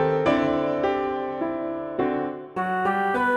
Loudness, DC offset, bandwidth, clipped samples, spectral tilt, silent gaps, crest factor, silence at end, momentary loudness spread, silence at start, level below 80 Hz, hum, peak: -25 LUFS; under 0.1%; 12 kHz; under 0.1%; -7 dB/octave; none; 16 dB; 0 s; 8 LU; 0 s; -54 dBFS; none; -8 dBFS